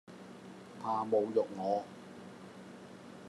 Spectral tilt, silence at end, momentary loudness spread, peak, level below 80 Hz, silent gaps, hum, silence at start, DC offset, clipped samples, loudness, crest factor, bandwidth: -6.5 dB/octave; 0 s; 20 LU; -18 dBFS; -84 dBFS; none; none; 0.1 s; under 0.1%; under 0.1%; -34 LUFS; 20 dB; 12 kHz